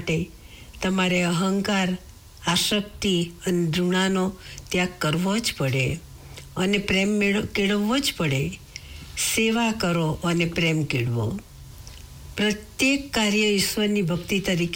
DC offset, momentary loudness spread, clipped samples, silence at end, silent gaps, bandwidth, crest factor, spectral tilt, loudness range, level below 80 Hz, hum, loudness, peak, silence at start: under 0.1%; 15 LU; under 0.1%; 0 s; none; 19.5 kHz; 12 dB; -4.5 dB/octave; 1 LU; -46 dBFS; none; -23 LUFS; -12 dBFS; 0 s